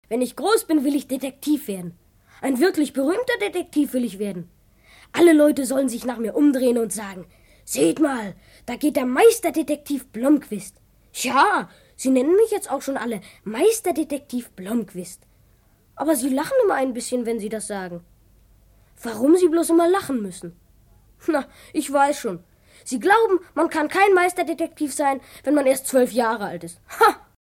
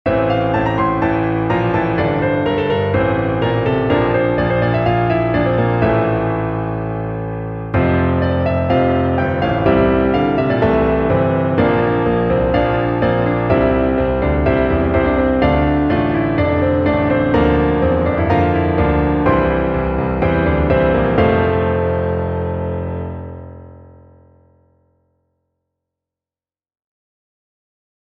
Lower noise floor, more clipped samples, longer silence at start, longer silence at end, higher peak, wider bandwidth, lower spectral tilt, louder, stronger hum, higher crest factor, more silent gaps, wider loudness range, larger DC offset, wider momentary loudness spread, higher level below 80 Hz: second, -57 dBFS vs under -90 dBFS; neither; about the same, 0.1 s vs 0.05 s; second, 0.4 s vs 4.2 s; about the same, -4 dBFS vs -2 dBFS; first, 17 kHz vs 5.8 kHz; second, -4 dB/octave vs -10 dB/octave; second, -21 LUFS vs -16 LUFS; neither; about the same, 18 dB vs 14 dB; neither; about the same, 4 LU vs 3 LU; neither; first, 16 LU vs 6 LU; second, -58 dBFS vs -30 dBFS